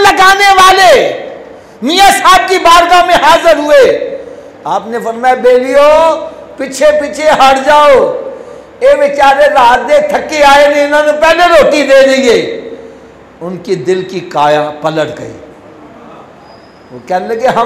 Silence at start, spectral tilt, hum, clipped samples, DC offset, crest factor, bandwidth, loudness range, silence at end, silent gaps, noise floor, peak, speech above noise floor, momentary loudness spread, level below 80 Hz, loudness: 0 s; -3 dB/octave; none; 0.2%; under 0.1%; 8 dB; 16.5 kHz; 9 LU; 0 s; none; -35 dBFS; 0 dBFS; 29 dB; 16 LU; -38 dBFS; -7 LUFS